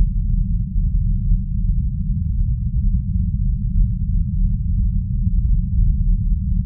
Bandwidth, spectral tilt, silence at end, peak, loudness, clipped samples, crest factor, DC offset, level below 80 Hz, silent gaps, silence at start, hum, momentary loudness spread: 0.3 kHz; -29 dB/octave; 0 s; -6 dBFS; -22 LUFS; under 0.1%; 12 dB; 0.1%; -18 dBFS; none; 0 s; none; 2 LU